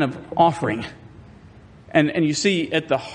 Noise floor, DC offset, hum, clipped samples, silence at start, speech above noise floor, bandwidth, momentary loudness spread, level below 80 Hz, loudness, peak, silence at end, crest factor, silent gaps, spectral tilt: -46 dBFS; under 0.1%; none; under 0.1%; 0 s; 25 dB; 10 kHz; 7 LU; -56 dBFS; -21 LUFS; -4 dBFS; 0 s; 18 dB; none; -5 dB/octave